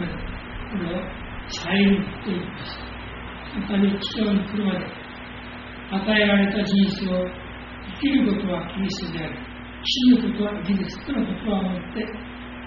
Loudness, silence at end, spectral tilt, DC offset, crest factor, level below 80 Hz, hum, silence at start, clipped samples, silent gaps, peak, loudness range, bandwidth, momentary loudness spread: -24 LUFS; 0 s; -4.5 dB/octave; under 0.1%; 18 dB; -42 dBFS; none; 0 s; under 0.1%; none; -6 dBFS; 4 LU; 6.2 kHz; 17 LU